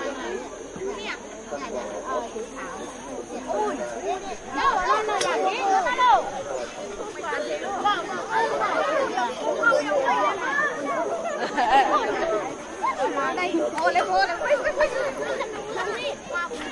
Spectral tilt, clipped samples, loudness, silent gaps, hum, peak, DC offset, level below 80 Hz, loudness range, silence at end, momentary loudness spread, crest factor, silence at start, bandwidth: -2.5 dB/octave; under 0.1%; -25 LUFS; none; none; -6 dBFS; under 0.1%; -54 dBFS; 8 LU; 0 s; 13 LU; 18 dB; 0 s; 11.5 kHz